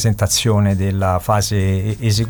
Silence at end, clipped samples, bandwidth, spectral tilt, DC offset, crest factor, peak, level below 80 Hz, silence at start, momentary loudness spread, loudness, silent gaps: 0 s; under 0.1%; 19 kHz; -5 dB/octave; under 0.1%; 12 dB; -4 dBFS; -36 dBFS; 0 s; 4 LU; -17 LUFS; none